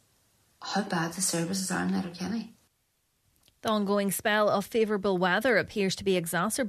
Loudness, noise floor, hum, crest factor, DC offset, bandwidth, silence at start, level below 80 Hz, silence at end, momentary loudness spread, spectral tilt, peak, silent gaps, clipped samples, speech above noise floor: -28 LUFS; -74 dBFS; none; 18 dB; under 0.1%; 14 kHz; 0.6 s; -64 dBFS; 0 s; 9 LU; -4 dB/octave; -10 dBFS; none; under 0.1%; 46 dB